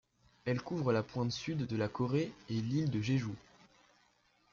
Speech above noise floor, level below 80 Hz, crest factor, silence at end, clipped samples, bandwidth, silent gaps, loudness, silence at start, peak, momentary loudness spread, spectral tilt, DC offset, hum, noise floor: 37 dB; -66 dBFS; 16 dB; 1.15 s; under 0.1%; 7.4 kHz; none; -36 LUFS; 0.45 s; -20 dBFS; 5 LU; -6.5 dB/octave; under 0.1%; 60 Hz at -55 dBFS; -71 dBFS